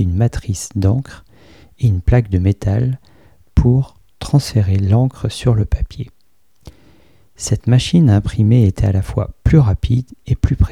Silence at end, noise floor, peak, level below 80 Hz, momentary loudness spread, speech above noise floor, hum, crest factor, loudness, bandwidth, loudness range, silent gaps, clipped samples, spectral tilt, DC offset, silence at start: 0 s; -61 dBFS; 0 dBFS; -26 dBFS; 10 LU; 47 dB; none; 14 dB; -16 LUFS; 13 kHz; 4 LU; none; under 0.1%; -7 dB/octave; 0.4%; 0 s